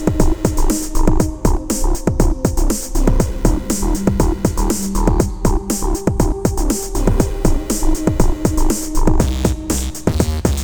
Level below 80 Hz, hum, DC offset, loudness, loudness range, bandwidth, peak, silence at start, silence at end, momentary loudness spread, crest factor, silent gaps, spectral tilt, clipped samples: -18 dBFS; none; under 0.1%; -18 LUFS; 0 LU; over 20 kHz; 0 dBFS; 0 s; 0 s; 3 LU; 14 dB; none; -5.5 dB/octave; under 0.1%